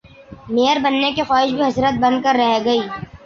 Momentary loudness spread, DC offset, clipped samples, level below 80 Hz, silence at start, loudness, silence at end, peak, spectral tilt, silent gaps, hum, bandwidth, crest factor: 4 LU; under 0.1%; under 0.1%; -50 dBFS; 0.3 s; -17 LUFS; 0.1 s; -4 dBFS; -5 dB/octave; none; none; 7.2 kHz; 14 dB